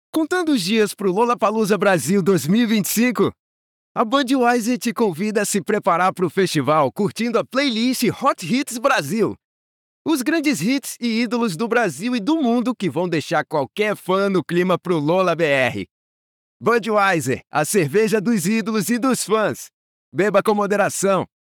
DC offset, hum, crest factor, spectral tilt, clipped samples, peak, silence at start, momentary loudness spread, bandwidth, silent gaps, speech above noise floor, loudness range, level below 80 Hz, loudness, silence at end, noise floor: under 0.1%; none; 16 dB; -4.5 dB/octave; under 0.1%; -4 dBFS; 0.15 s; 5 LU; over 20 kHz; 3.39-3.95 s, 9.44-10.05 s, 15.91-16.60 s, 19.74-20.12 s; over 71 dB; 2 LU; -70 dBFS; -19 LUFS; 0.3 s; under -90 dBFS